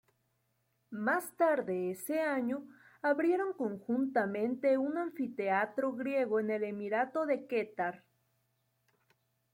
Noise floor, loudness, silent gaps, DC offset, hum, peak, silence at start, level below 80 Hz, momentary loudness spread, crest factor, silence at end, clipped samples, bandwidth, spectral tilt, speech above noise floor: -78 dBFS; -33 LUFS; none; under 0.1%; none; -18 dBFS; 0.9 s; -84 dBFS; 6 LU; 16 dB; 1.55 s; under 0.1%; 16.5 kHz; -6 dB/octave; 45 dB